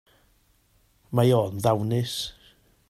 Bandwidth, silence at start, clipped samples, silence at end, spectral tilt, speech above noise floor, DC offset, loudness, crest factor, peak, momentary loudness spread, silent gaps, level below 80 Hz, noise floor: 14.5 kHz; 1.1 s; under 0.1%; 0.6 s; -6.5 dB/octave; 41 dB; under 0.1%; -25 LUFS; 18 dB; -8 dBFS; 10 LU; none; -58 dBFS; -64 dBFS